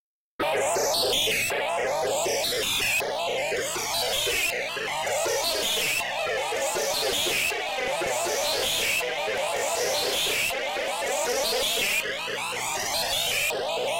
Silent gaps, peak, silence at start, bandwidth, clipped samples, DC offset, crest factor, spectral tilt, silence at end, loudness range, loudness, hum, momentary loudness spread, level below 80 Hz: none; -16 dBFS; 0.4 s; 16 kHz; under 0.1%; under 0.1%; 12 dB; -0.5 dB/octave; 0 s; 1 LU; -25 LUFS; none; 5 LU; -56 dBFS